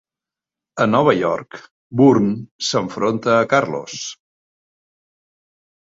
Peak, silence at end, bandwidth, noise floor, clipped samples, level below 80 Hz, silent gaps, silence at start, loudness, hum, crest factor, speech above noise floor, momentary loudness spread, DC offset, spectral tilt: -2 dBFS; 1.85 s; 8 kHz; -89 dBFS; under 0.1%; -60 dBFS; 1.71-1.90 s, 2.51-2.59 s; 0.75 s; -18 LUFS; none; 18 dB; 71 dB; 15 LU; under 0.1%; -5.5 dB/octave